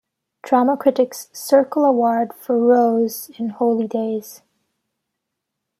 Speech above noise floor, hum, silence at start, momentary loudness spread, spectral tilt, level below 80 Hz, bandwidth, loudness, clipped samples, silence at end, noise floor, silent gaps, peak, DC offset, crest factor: 62 dB; none; 0.45 s; 11 LU; -5.5 dB/octave; -72 dBFS; 15.5 kHz; -18 LUFS; under 0.1%; 1.45 s; -80 dBFS; none; -2 dBFS; under 0.1%; 18 dB